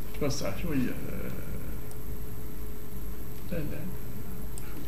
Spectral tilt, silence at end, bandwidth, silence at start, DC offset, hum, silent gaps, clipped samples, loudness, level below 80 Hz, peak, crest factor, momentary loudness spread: -5.5 dB/octave; 0 s; 16 kHz; 0 s; 5%; none; none; under 0.1%; -37 LUFS; -42 dBFS; -16 dBFS; 18 dB; 10 LU